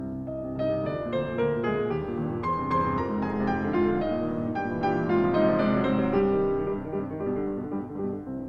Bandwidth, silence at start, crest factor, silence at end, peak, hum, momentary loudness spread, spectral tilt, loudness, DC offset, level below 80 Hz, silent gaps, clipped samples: 6.2 kHz; 0 s; 16 dB; 0 s; -12 dBFS; none; 8 LU; -9.5 dB/octave; -27 LUFS; under 0.1%; -48 dBFS; none; under 0.1%